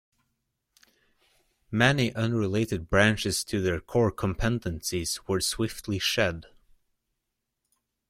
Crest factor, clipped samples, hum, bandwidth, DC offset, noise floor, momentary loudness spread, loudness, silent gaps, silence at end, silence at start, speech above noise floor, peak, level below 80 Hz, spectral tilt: 22 dB; under 0.1%; none; 16.5 kHz; under 0.1%; -82 dBFS; 8 LU; -27 LUFS; none; 1.65 s; 1.7 s; 56 dB; -8 dBFS; -48 dBFS; -4.5 dB/octave